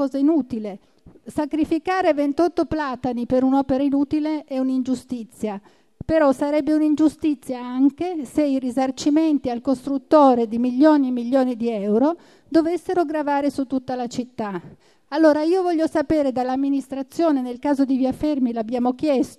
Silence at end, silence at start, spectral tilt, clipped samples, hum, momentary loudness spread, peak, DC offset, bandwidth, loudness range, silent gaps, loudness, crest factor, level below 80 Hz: 0.05 s; 0 s; -6 dB/octave; under 0.1%; none; 11 LU; -4 dBFS; under 0.1%; 12.5 kHz; 4 LU; none; -21 LUFS; 16 dB; -52 dBFS